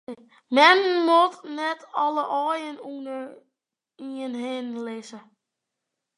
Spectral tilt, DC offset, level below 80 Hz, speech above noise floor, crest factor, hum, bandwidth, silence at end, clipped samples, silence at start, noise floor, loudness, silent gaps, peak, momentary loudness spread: -2.5 dB/octave; under 0.1%; -84 dBFS; 60 dB; 22 dB; none; 11.5 kHz; 1 s; under 0.1%; 0.1 s; -84 dBFS; -22 LUFS; none; -2 dBFS; 23 LU